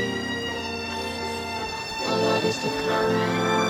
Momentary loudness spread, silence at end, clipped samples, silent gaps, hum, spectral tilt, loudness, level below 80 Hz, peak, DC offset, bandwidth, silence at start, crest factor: 7 LU; 0 s; under 0.1%; none; none; -4 dB/octave; -26 LUFS; -52 dBFS; -10 dBFS; under 0.1%; 17 kHz; 0 s; 16 dB